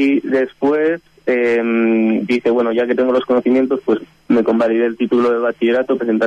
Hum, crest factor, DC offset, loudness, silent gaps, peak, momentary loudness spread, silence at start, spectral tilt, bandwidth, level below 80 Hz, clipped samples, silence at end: none; 10 dB; under 0.1%; -16 LUFS; none; -4 dBFS; 4 LU; 0 s; -7 dB/octave; 7.6 kHz; -58 dBFS; under 0.1%; 0 s